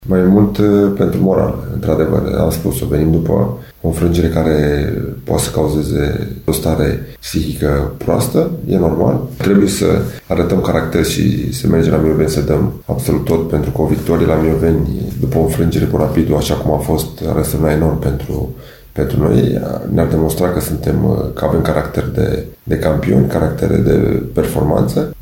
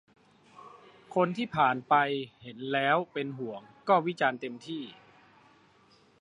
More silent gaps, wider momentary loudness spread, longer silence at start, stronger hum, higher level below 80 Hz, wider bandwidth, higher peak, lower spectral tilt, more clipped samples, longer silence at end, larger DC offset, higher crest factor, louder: neither; second, 6 LU vs 14 LU; second, 0 s vs 0.6 s; neither; first, -28 dBFS vs -76 dBFS; first, 17 kHz vs 10.5 kHz; first, 0 dBFS vs -10 dBFS; about the same, -7 dB/octave vs -6.5 dB/octave; neither; second, 0 s vs 1.25 s; neither; second, 14 dB vs 20 dB; first, -15 LUFS vs -29 LUFS